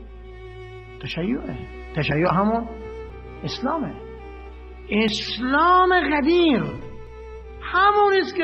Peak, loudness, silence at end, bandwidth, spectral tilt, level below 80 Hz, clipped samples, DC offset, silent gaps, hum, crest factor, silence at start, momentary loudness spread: -6 dBFS; -21 LUFS; 0 s; 8.2 kHz; -6 dB/octave; -42 dBFS; under 0.1%; under 0.1%; none; none; 18 dB; 0 s; 23 LU